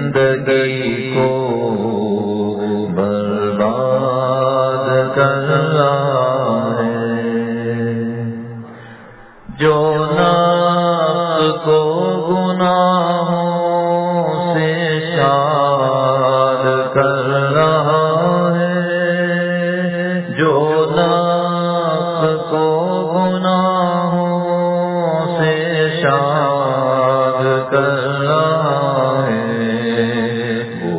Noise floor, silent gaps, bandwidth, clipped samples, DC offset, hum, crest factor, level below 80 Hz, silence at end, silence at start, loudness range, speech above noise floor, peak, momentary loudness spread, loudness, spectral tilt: -39 dBFS; none; 4 kHz; under 0.1%; under 0.1%; none; 14 dB; -54 dBFS; 0 s; 0 s; 3 LU; 24 dB; 0 dBFS; 5 LU; -16 LUFS; -10.5 dB/octave